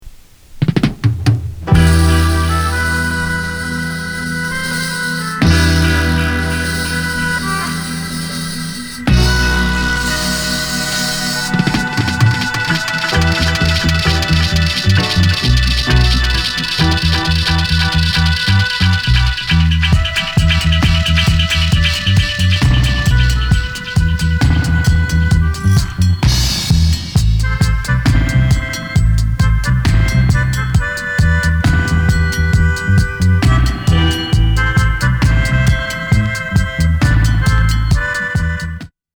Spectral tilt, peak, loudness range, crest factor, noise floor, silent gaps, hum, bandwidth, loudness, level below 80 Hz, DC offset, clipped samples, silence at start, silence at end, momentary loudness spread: -4.5 dB/octave; 0 dBFS; 3 LU; 14 dB; -36 dBFS; none; none; over 20 kHz; -14 LUFS; -18 dBFS; under 0.1%; under 0.1%; 0.05 s; 0.3 s; 5 LU